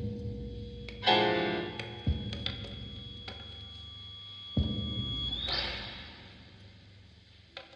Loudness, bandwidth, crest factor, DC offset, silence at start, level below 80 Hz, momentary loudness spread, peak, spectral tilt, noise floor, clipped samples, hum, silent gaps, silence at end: -34 LUFS; 9 kHz; 24 dB; under 0.1%; 0 s; -46 dBFS; 21 LU; -10 dBFS; -6 dB/octave; -57 dBFS; under 0.1%; none; none; 0 s